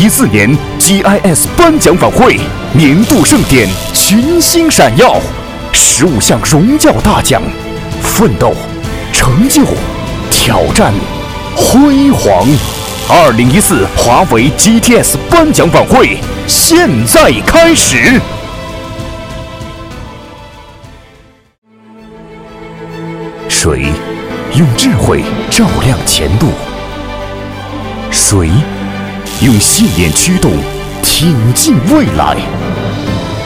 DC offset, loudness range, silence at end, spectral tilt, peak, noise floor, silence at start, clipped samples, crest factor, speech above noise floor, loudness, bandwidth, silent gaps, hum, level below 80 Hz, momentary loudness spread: under 0.1%; 8 LU; 0 s; -4 dB/octave; 0 dBFS; -41 dBFS; 0 s; 3%; 8 dB; 34 dB; -8 LUFS; over 20 kHz; 21.58-21.62 s; none; -24 dBFS; 16 LU